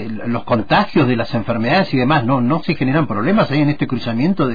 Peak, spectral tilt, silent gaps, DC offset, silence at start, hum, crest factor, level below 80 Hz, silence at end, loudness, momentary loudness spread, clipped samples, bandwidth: -4 dBFS; -8.5 dB/octave; none; 3%; 0 s; none; 12 dB; -44 dBFS; 0 s; -16 LUFS; 5 LU; under 0.1%; 5 kHz